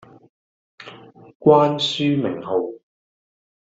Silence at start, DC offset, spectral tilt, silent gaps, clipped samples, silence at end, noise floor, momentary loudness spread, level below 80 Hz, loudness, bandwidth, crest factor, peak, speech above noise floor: 0.8 s; under 0.1%; -6 dB/octave; 1.35-1.40 s; under 0.1%; 1 s; -43 dBFS; 25 LU; -64 dBFS; -19 LUFS; 7.8 kHz; 20 dB; -2 dBFS; 25 dB